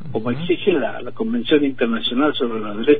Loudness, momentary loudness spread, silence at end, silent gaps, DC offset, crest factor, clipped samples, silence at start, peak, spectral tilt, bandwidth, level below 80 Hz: -20 LUFS; 7 LU; 0 s; none; 4%; 16 dB; under 0.1%; 0 s; -2 dBFS; -9 dB/octave; 4.7 kHz; -54 dBFS